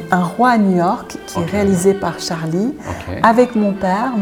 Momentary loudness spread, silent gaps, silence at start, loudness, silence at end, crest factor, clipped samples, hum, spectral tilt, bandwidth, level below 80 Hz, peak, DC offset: 11 LU; none; 0 s; -16 LUFS; 0 s; 16 dB; under 0.1%; none; -6 dB/octave; 16.5 kHz; -46 dBFS; 0 dBFS; under 0.1%